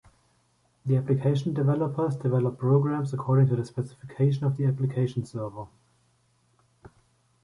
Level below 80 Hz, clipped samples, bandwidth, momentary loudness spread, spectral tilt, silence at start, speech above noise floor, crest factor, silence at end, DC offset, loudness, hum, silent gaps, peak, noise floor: -62 dBFS; under 0.1%; 10.5 kHz; 12 LU; -9.5 dB/octave; 0.85 s; 42 dB; 16 dB; 1.8 s; under 0.1%; -26 LUFS; none; none; -10 dBFS; -67 dBFS